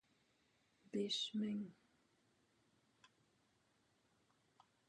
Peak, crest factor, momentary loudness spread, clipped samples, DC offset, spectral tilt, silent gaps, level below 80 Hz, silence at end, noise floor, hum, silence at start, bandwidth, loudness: -30 dBFS; 20 dB; 8 LU; under 0.1%; under 0.1%; -4.5 dB/octave; none; under -90 dBFS; 3.15 s; -79 dBFS; none; 0.95 s; 10 kHz; -43 LUFS